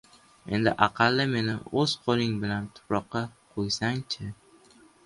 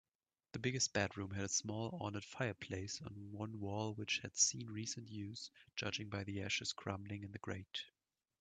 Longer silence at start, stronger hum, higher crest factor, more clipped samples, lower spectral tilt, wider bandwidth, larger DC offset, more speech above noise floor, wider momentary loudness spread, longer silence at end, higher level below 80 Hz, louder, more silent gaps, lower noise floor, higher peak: about the same, 0.45 s vs 0.55 s; neither; about the same, 24 dB vs 24 dB; neither; first, -5 dB/octave vs -3 dB/octave; first, 11.5 kHz vs 9.4 kHz; neither; second, 30 dB vs over 47 dB; about the same, 11 LU vs 12 LU; first, 0.7 s vs 0.5 s; first, -56 dBFS vs -76 dBFS; first, -27 LUFS vs -42 LUFS; neither; second, -57 dBFS vs under -90 dBFS; first, -4 dBFS vs -20 dBFS